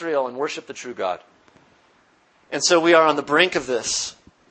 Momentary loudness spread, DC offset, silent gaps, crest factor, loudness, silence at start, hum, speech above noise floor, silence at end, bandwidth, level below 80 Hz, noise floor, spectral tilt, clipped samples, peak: 16 LU; under 0.1%; none; 22 dB; -20 LUFS; 0 s; none; 38 dB; 0.4 s; 8.8 kHz; -64 dBFS; -59 dBFS; -2 dB/octave; under 0.1%; 0 dBFS